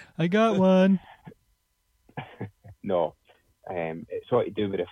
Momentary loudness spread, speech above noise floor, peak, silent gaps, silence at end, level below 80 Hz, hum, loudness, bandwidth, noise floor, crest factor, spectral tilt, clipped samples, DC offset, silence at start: 22 LU; 47 dB; -10 dBFS; none; 0 s; -64 dBFS; none; -25 LUFS; 6.8 kHz; -72 dBFS; 18 dB; -8 dB/octave; under 0.1%; under 0.1%; 0 s